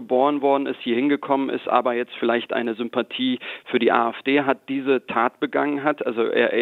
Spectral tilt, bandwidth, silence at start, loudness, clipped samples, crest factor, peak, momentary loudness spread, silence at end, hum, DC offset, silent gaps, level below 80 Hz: -7 dB/octave; 4.4 kHz; 0 s; -22 LUFS; under 0.1%; 20 dB; -2 dBFS; 5 LU; 0 s; none; under 0.1%; none; -74 dBFS